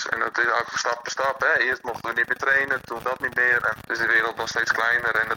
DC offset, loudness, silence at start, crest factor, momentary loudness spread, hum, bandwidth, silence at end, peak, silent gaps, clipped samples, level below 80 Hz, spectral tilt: under 0.1%; -22 LUFS; 0 s; 18 dB; 6 LU; none; 17 kHz; 0 s; -6 dBFS; none; under 0.1%; -58 dBFS; -2 dB/octave